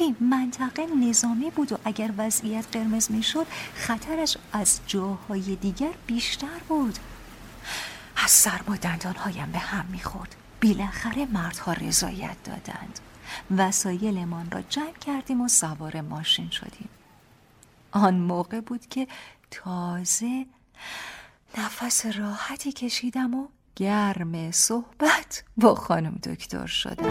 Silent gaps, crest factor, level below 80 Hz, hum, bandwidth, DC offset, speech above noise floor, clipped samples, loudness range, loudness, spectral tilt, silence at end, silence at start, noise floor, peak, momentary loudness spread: none; 24 dB; -50 dBFS; none; 16.5 kHz; under 0.1%; 30 dB; under 0.1%; 5 LU; -25 LUFS; -3 dB/octave; 0 s; 0 s; -56 dBFS; -4 dBFS; 16 LU